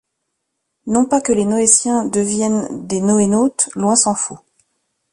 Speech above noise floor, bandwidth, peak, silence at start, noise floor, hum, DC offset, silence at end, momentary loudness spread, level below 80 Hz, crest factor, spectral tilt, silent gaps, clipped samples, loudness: 58 dB; 11.5 kHz; 0 dBFS; 0.85 s; -74 dBFS; none; under 0.1%; 0.75 s; 10 LU; -54 dBFS; 18 dB; -4 dB/octave; none; under 0.1%; -15 LUFS